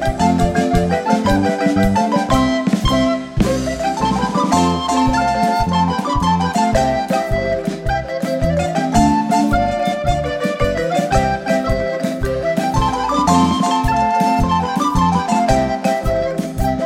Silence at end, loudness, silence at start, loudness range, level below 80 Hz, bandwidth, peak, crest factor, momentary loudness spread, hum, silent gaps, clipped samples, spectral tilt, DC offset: 0 s; -17 LUFS; 0 s; 2 LU; -28 dBFS; 16.5 kHz; 0 dBFS; 16 dB; 4 LU; none; none; under 0.1%; -6 dB/octave; under 0.1%